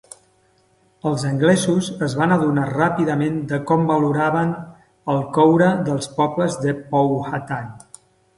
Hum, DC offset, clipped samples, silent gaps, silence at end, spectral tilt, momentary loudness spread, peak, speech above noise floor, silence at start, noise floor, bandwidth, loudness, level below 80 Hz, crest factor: none; under 0.1%; under 0.1%; none; 0.6 s; -6.5 dB/octave; 10 LU; -2 dBFS; 41 dB; 1.05 s; -59 dBFS; 11.5 kHz; -19 LUFS; -56 dBFS; 18 dB